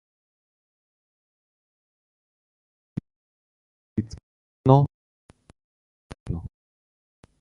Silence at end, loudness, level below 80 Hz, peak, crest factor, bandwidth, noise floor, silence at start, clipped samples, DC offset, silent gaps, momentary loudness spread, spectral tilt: 0.95 s; -24 LUFS; -50 dBFS; -4 dBFS; 26 dB; 6.8 kHz; under -90 dBFS; 3.95 s; under 0.1%; under 0.1%; 4.23-4.64 s, 4.94-5.29 s, 5.64-6.10 s, 6.20-6.26 s; 25 LU; -10 dB/octave